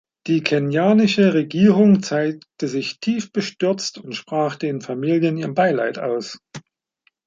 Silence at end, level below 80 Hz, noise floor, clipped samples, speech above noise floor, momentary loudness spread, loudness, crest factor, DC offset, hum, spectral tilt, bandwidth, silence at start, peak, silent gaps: 0.65 s; -64 dBFS; -66 dBFS; under 0.1%; 47 dB; 12 LU; -19 LUFS; 18 dB; under 0.1%; none; -6 dB/octave; 7.6 kHz; 0.25 s; -2 dBFS; none